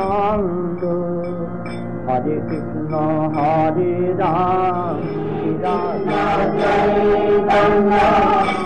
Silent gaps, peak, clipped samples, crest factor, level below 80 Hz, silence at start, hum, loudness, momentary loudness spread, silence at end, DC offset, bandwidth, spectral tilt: none; -6 dBFS; under 0.1%; 12 dB; -40 dBFS; 0 s; none; -18 LUFS; 10 LU; 0 s; 2%; 9 kHz; -8 dB/octave